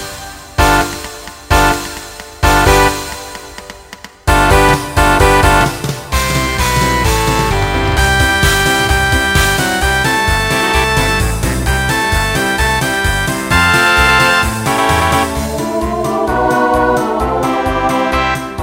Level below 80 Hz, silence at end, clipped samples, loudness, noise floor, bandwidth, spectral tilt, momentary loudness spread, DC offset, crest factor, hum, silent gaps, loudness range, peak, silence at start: -22 dBFS; 0 s; under 0.1%; -12 LUFS; -35 dBFS; 16.5 kHz; -4 dB/octave; 12 LU; under 0.1%; 12 dB; none; none; 2 LU; 0 dBFS; 0 s